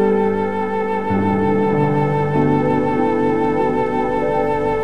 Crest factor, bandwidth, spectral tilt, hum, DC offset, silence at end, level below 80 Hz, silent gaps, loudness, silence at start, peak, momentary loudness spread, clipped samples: 12 dB; 9.2 kHz; -9 dB/octave; none; 2%; 0 s; -42 dBFS; none; -18 LUFS; 0 s; -4 dBFS; 3 LU; under 0.1%